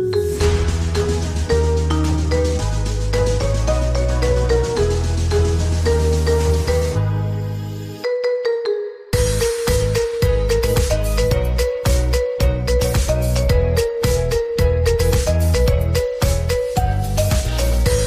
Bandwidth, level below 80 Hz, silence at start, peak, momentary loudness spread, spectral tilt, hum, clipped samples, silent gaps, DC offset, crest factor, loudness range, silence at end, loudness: 15.5 kHz; -22 dBFS; 0 s; -4 dBFS; 4 LU; -5.5 dB/octave; none; under 0.1%; none; under 0.1%; 12 dB; 2 LU; 0 s; -19 LUFS